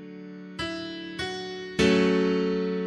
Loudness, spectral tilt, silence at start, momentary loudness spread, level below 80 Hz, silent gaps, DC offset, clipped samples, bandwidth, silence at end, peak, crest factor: -26 LUFS; -5.5 dB/octave; 0 s; 17 LU; -52 dBFS; none; under 0.1%; under 0.1%; 11.5 kHz; 0 s; -8 dBFS; 20 dB